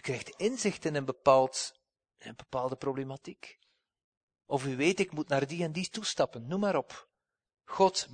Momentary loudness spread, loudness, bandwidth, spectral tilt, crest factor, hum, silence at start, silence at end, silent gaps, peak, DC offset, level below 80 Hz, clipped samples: 21 LU; -31 LUFS; 9.6 kHz; -4.5 dB/octave; 22 dB; none; 0.05 s; 0 s; 4.04-4.28 s; -10 dBFS; under 0.1%; -70 dBFS; under 0.1%